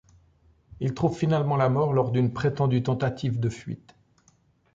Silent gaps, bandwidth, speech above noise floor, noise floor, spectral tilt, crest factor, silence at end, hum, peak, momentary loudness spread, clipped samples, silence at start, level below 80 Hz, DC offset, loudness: none; 7.8 kHz; 39 dB; -63 dBFS; -8 dB/octave; 16 dB; 1 s; none; -10 dBFS; 9 LU; under 0.1%; 0.8 s; -54 dBFS; under 0.1%; -25 LUFS